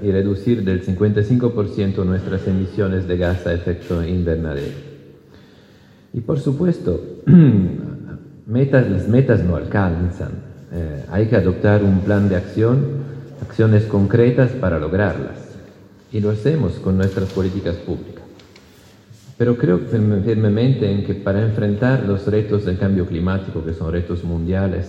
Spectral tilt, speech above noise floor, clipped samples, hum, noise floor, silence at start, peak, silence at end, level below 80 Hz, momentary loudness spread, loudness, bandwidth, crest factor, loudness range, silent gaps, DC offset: -9.5 dB/octave; 30 dB; under 0.1%; none; -47 dBFS; 0 s; 0 dBFS; 0 s; -40 dBFS; 13 LU; -18 LUFS; 7.8 kHz; 18 dB; 6 LU; none; under 0.1%